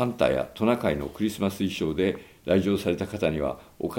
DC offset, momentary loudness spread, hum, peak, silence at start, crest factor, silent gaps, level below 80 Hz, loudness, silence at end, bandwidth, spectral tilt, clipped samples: under 0.1%; 6 LU; none; -8 dBFS; 0 s; 18 dB; none; -50 dBFS; -27 LUFS; 0 s; 17 kHz; -6.5 dB/octave; under 0.1%